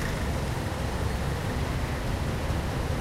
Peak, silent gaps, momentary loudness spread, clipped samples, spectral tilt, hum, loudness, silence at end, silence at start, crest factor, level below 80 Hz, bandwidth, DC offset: -16 dBFS; none; 1 LU; under 0.1%; -5.5 dB/octave; none; -30 LUFS; 0 s; 0 s; 14 dB; -34 dBFS; 16 kHz; under 0.1%